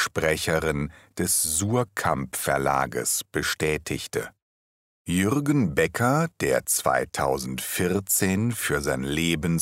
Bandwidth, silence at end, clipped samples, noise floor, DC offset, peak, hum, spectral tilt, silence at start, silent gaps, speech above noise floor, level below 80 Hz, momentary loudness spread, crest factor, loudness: 16 kHz; 0 s; under 0.1%; under -90 dBFS; under 0.1%; -8 dBFS; none; -4 dB/octave; 0 s; 4.42-5.05 s; over 65 dB; -46 dBFS; 7 LU; 18 dB; -24 LUFS